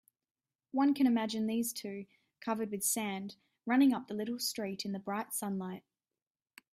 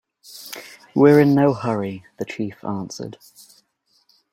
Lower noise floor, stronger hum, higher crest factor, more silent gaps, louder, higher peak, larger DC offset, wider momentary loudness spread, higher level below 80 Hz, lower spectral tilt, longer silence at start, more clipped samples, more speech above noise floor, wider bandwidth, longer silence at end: first, under -90 dBFS vs -64 dBFS; neither; about the same, 16 dB vs 20 dB; neither; second, -34 LUFS vs -19 LUFS; second, -18 dBFS vs -2 dBFS; neither; second, 16 LU vs 22 LU; second, -80 dBFS vs -62 dBFS; second, -4 dB/octave vs -7 dB/octave; first, 0.75 s vs 0.35 s; neither; first, over 57 dB vs 46 dB; about the same, 16 kHz vs 16.5 kHz; second, 0.95 s vs 1.2 s